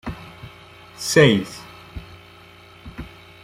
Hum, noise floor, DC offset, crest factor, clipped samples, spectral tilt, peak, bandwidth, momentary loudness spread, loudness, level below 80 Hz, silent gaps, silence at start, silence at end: none; -46 dBFS; under 0.1%; 22 dB; under 0.1%; -4.5 dB/octave; -2 dBFS; 16 kHz; 27 LU; -17 LUFS; -46 dBFS; none; 0.05 s; 0.35 s